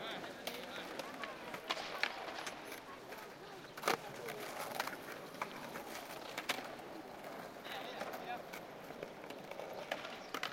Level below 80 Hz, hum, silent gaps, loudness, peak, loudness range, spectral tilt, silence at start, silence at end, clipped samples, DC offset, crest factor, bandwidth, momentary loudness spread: -76 dBFS; none; none; -44 LUFS; -14 dBFS; 4 LU; -2.5 dB/octave; 0 s; 0 s; under 0.1%; under 0.1%; 30 dB; 16.5 kHz; 10 LU